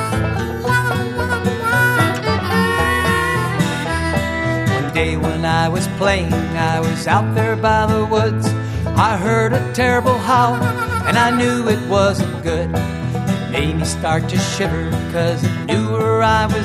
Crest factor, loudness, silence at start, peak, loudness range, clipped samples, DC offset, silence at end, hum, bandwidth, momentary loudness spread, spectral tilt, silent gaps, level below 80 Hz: 16 dB; -17 LUFS; 0 s; 0 dBFS; 3 LU; under 0.1%; under 0.1%; 0 s; none; 14 kHz; 5 LU; -5.5 dB/octave; none; -34 dBFS